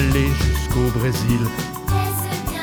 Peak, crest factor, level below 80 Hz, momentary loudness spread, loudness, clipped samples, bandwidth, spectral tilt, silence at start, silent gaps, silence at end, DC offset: -6 dBFS; 14 dB; -26 dBFS; 6 LU; -21 LUFS; under 0.1%; over 20 kHz; -5.5 dB/octave; 0 s; none; 0 s; under 0.1%